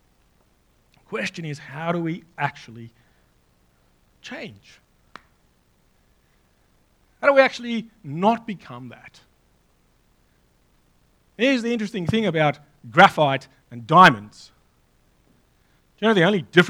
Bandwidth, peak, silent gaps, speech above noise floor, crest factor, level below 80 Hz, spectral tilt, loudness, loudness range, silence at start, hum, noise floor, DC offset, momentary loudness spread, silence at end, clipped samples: 18.5 kHz; 0 dBFS; none; 41 dB; 24 dB; -62 dBFS; -5.5 dB/octave; -20 LUFS; 13 LU; 1.1 s; 60 Hz at -55 dBFS; -62 dBFS; under 0.1%; 25 LU; 0 s; under 0.1%